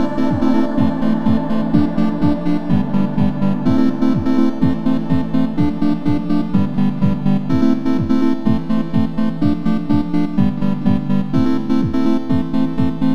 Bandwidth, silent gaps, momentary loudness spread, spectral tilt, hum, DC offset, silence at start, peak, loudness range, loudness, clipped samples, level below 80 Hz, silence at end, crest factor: 7 kHz; none; 3 LU; -9 dB/octave; none; 9%; 0 s; -2 dBFS; 1 LU; -17 LUFS; under 0.1%; -36 dBFS; 0 s; 14 dB